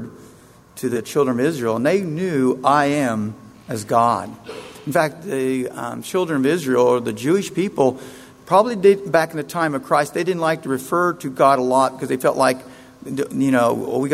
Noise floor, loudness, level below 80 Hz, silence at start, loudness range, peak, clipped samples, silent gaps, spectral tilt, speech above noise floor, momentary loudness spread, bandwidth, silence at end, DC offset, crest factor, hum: -47 dBFS; -19 LUFS; -60 dBFS; 0 s; 3 LU; -2 dBFS; under 0.1%; none; -5.5 dB/octave; 28 dB; 12 LU; 16 kHz; 0 s; under 0.1%; 18 dB; none